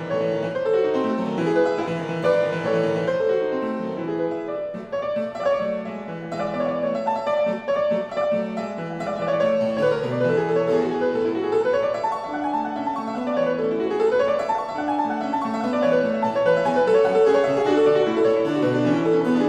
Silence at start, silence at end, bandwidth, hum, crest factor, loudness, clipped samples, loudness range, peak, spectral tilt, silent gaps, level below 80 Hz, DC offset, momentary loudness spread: 0 s; 0 s; 9.6 kHz; none; 14 dB; -22 LUFS; under 0.1%; 6 LU; -8 dBFS; -7 dB/octave; none; -60 dBFS; under 0.1%; 8 LU